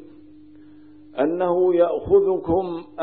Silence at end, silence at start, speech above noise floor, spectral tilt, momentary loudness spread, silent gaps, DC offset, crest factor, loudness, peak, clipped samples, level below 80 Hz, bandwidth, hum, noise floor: 0 s; 0 s; 27 dB; -12 dB/octave; 8 LU; none; 0.3%; 16 dB; -20 LUFS; -6 dBFS; under 0.1%; -50 dBFS; 4.3 kHz; 50 Hz at -60 dBFS; -47 dBFS